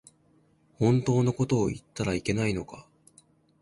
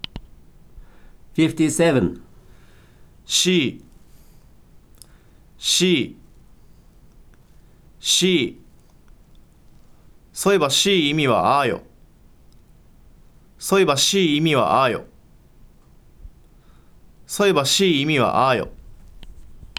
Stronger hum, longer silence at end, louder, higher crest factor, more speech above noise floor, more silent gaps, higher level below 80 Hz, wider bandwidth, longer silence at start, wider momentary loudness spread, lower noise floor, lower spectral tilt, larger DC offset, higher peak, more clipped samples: neither; first, 0.8 s vs 0.1 s; second, -27 LUFS vs -18 LUFS; about the same, 18 dB vs 20 dB; first, 38 dB vs 31 dB; neither; about the same, -52 dBFS vs -48 dBFS; second, 11.5 kHz vs 19.5 kHz; first, 0.8 s vs 0.15 s; second, 11 LU vs 14 LU; first, -64 dBFS vs -50 dBFS; first, -6.5 dB/octave vs -3.5 dB/octave; neither; second, -12 dBFS vs -2 dBFS; neither